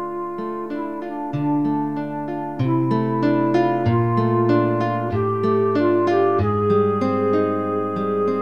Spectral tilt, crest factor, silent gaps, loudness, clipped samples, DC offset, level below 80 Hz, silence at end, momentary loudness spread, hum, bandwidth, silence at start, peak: -9.5 dB/octave; 14 dB; none; -20 LUFS; under 0.1%; 0.6%; -52 dBFS; 0 s; 9 LU; none; 6.8 kHz; 0 s; -6 dBFS